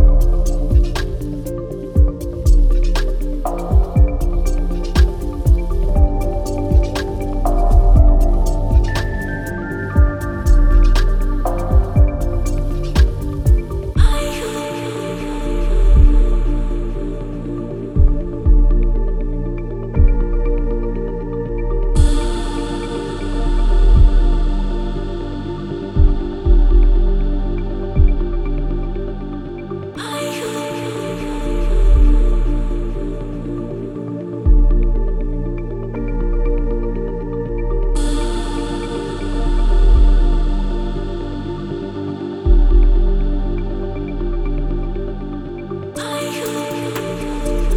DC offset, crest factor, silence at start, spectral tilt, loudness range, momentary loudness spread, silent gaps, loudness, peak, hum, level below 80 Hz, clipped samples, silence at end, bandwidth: under 0.1%; 14 dB; 0 s; -7 dB/octave; 5 LU; 10 LU; none; -20 LUFS; 0 dBFS; none; -16 dBFS; under 0.1%; 0 s; 11.5 kHz